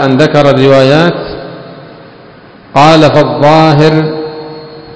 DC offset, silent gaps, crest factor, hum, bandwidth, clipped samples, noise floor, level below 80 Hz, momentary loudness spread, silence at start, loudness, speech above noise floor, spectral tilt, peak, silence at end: under 0.1%; none; 8 dB; none; 8 kHz; 7%; -34 dBFS; -40 dBFS; 20 LU; 0 s; -6 LUFS; 29 dB; -6.5 dB/octave; 0 dBFS; 0 s